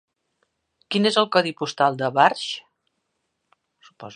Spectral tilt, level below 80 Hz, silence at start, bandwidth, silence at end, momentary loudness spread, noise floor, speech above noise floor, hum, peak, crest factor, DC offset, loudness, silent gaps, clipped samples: -4.5 dB/octave; -76 dBFS; 0.9 s; 10.5 kHz; 0 s; 11 LU; -76 dBFS; 55 dB; none; -2 dBFS; 22 dB; under 0.1%; -21 LUFS; none; under 0.1%